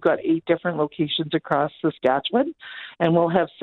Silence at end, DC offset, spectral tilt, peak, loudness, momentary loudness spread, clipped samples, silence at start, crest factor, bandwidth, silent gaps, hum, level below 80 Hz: 0 s; under 0.1%; -8.5 dB/octave; -6 dBFS; -22 LUFS; 5 LU; under 0.1%; 0 s; 16 dB; 4.4 kHz; none; none; -64 dBFS